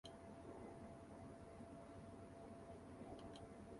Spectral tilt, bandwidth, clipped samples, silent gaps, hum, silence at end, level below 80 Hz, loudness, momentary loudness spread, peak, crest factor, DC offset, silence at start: -6 dB/octave; 11.5 kHz; under 0.1%; none; none; 0 s; -70 dBFS; -58 LUFS; 2 LU; -42 dBFS; 14 dB; under 0.1%; 0.05 s